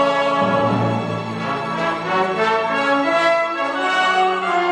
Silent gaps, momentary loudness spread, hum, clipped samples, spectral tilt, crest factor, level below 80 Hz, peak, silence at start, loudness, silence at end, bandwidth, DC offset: none; 7 LU; none; under 0.1%; -5.5 dB/octave; 14 dB; -58 dBFS; -4 dBFS; 0 s; -18 LUFS; 0 s; 11 kHz; under 0.1%